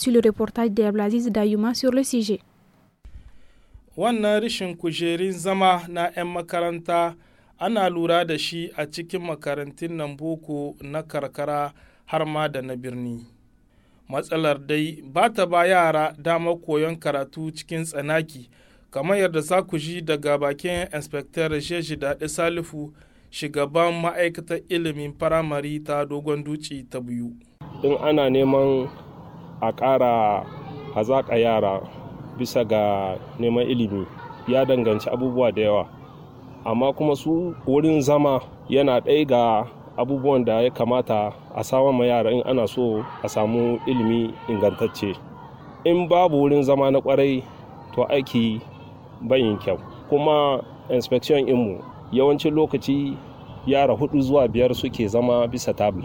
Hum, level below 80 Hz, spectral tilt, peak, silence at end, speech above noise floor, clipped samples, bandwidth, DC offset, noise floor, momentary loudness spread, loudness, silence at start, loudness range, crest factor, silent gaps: none; -52 dBFS; -6 dB/octave; -6 dBFS; 0 s; 37 dB; under 0.1%; 17 kHz; under 0.1%; -58 dBFS; 13 LU; -22 LUFS; 0 s; 6 LU; 18 dB; none